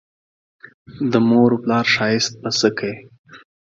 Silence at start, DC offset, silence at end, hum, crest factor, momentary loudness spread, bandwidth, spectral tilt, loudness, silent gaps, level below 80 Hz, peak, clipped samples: 0.9 s; under 0.1%; 0.35 s; none; 20 dB; 12 LU; 7.8 kHz; -4.5 dB/octave; -18 LUFS; 3.19-3.24 s; -60 dBFS; 0 dBFS; under 0.1%